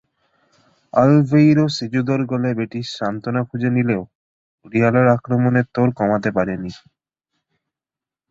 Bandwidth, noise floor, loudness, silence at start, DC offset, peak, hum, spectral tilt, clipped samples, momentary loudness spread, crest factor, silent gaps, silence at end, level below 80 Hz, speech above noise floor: 7.8 kHz; -89 dBFS; -18 LUFS; 0.95 s; under 0.1%; -2 dBFS; none; -8 dB/octave; under 0.1%; 11 LU; 18 dB; 4.15-4.58 s; 1.55 s; -54 dBFS; 72 dB